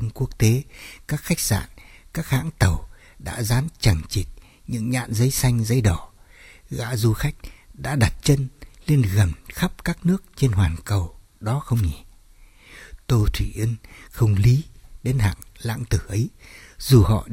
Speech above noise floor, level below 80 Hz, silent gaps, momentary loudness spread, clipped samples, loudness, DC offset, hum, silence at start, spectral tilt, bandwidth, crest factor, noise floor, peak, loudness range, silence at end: 28 dB; -34 dBFS; none; 15 LU; under 0.1%; -23 LUFS; under 0.1%; none; 0 s; -5.5 dB/octave; 16.5 kHz; 20 dB; -49 dBFS; -2 dBFS; 3 LU; 0 s